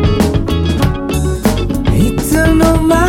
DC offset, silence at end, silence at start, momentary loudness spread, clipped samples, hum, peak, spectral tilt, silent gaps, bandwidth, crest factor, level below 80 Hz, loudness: under 0.1%; 0 s; 0 s; 5 LU; under 0.1%; none; 0 dBFS; -6 dB/octave; none; 17.5 kHz; 12 dB; -18 dBFS; -13 LUFS